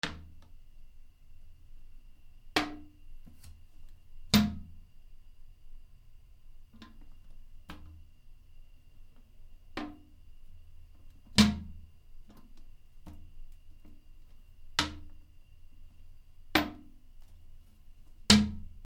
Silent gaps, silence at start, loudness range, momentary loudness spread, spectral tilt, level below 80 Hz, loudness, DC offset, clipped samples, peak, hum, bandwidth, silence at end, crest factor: none; 0.05 s; 23 LU; 32 LU; -3.5 dB/octave; -50 dBFS; -29 LUFS; under 0.1%; under 0.1%; -4 dBFS; none; 16 kHz; 0 s; 34 dB